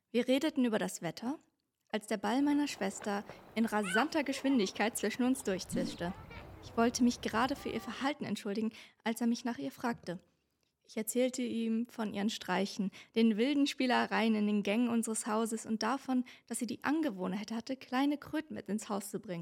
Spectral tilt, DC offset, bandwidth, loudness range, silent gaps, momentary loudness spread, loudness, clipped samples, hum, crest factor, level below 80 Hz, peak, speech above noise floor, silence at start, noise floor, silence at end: -4.5 dB/octave; under 0.1%; 16.5 kHz; 5 LU; none; 10 LU; -34 LUFS; under 0.1%; none; 18 dB; -68 dBFS; -16 dBFS; 46 dB; 0.15 s; -80 dBFS; 0 s